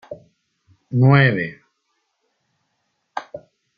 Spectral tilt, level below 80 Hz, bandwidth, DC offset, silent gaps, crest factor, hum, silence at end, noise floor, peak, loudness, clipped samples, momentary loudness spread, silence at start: -9 dB/octave; -60 dBFS; 5 kHz; under 0.1%; none; 22 dB; none; 0.4 s; -72 dBFS; -2 dBFS; -17 LUFS; under 0.1%; 26 LU; 0.1 s